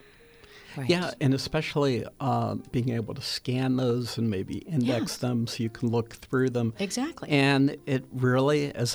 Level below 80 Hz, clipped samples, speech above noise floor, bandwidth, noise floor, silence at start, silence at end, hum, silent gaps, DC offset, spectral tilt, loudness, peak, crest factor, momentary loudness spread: -58 dBFS; under 0.1%; 27 dB; over 20 kHz; -53 dBFS; 0.5 s; 0 s; none; none; under 0.1%; -6 dB/octave; -27 LUFS; -10 dBFS; 16 dB; 7 LU